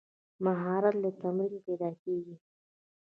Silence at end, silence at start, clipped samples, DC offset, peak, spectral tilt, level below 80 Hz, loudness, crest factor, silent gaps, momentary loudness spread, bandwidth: 0.8 s; 0.4 s; under 0.1%; under 0.1%; -14 dBFS; -11 dB/octave; -82 dBFS; -32 LUFS; 20 dB; 1.99-2.06 s; 8 LU; 4.3 kHz